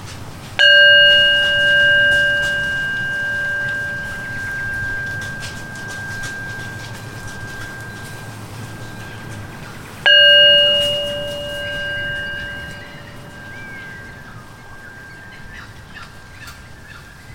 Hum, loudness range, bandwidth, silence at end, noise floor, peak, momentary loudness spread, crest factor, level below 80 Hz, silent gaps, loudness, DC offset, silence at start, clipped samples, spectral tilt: none; 23 LU; 17 kHz; 0 s; -38 dBFS; 0 dBFS; 28 LU; 18 dB; -42 dBFS; none; -13 LUFS; under 0.1%; 0 s; under 0.1%; -2.5 dB/octave